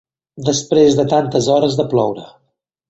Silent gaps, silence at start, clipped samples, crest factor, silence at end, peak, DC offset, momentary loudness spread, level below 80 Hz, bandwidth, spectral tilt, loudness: none; 0.35 s; under 0.1%; 16 dB; 0.65 s; 0 dBFS; under 0.1%; 9 LU; -52 dBFS; 8.2 kHz; -5.5 dB/octave; -15 LUFS